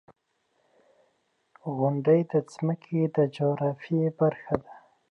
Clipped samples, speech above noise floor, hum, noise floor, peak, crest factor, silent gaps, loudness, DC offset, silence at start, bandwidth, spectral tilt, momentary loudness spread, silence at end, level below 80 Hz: under 0.1%; 47 dB; none; -72 dBFS; -6 dBFS; 22 dB; none; -27 LUFS; under 0.1%; 1.65 s; 9 kHz; -9 dB/octave; 9 LU; 0.35 s; -64 dBFS